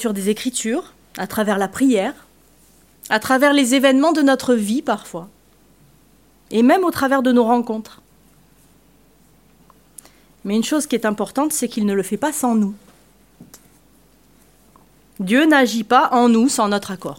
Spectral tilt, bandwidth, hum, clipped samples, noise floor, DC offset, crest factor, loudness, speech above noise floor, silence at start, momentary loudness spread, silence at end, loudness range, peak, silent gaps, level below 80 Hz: -4 dB/octave; 16.5 kHz; none; under 0.1%; -54 dBFS; under 0.1%; 18 dB; -17 LUFS; 36 dB; 0 s; 12 LU; 0.05 s; 8 LU; -2 dBFS; none; -58 dBFS